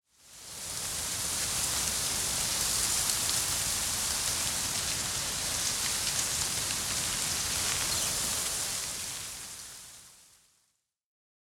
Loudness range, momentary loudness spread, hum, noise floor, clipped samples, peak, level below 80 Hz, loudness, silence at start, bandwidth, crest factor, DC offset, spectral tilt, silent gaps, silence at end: 4 LU; 11 LU; none; -76 dBFS; under 0.1%; -8 dBFS; -52 dBFS; -29 LUFS; 0.25 s; 17.5 kHz; 24 dB; under 0.1%; 0 dB/octave; none; 1.25 s